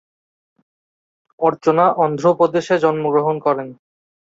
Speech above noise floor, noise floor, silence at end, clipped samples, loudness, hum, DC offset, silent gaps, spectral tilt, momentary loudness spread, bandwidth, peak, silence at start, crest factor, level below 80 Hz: over 74 dB; under -90 dBFS; 0.6 s; under 0.1%; -17 LUFS; none; under 0.1%; none; -7 dB/octave; 5 LU; 7.8 kHz; -2 dBFS; 1.4 s; 16 dB; -64 dBFS